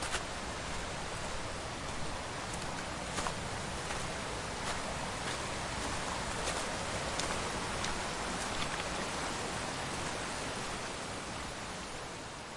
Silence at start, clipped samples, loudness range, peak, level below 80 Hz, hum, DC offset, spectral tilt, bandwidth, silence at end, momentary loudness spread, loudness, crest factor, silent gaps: 0 s; under 0.1%; 3 LU; -18 dBFS; -50 dBFS; none; under 0.1%; -3 dB/octave; 11.5 kHz; 0 s; 4 LU; -37 LUFS; 20 dB; none